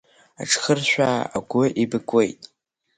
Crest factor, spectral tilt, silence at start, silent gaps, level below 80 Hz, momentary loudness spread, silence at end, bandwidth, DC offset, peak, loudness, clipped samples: 18 dB; -4 dB/octave; 0.4 s; none; -62 dBFS; 7 LU; 0.5 s; 9.6 kHz; under 0.1%; -4 dBFS; -21 LUFS; under 0.1%